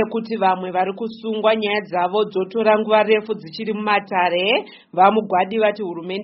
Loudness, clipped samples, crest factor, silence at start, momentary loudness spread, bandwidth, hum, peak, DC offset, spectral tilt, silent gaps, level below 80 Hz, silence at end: -19 LUFS; under 0.1%; 18 dB; 0 s; 11 LU; 5.8 kHz; none; 0 dBFS; under 0.1%; -2.5 dB/octave; none; -68 dBFS; 0 s